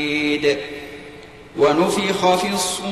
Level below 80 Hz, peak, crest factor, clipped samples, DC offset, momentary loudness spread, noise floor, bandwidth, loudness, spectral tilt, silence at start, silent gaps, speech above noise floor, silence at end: -52 dBFS; -6 dBFS; 14 dB; under 0.1%; 0.2%; 18 LU; -40 dBFS; 15 kHz; -19 LUFS; -3.5 dB/octave; 0 s; none; 21 dB; 0 s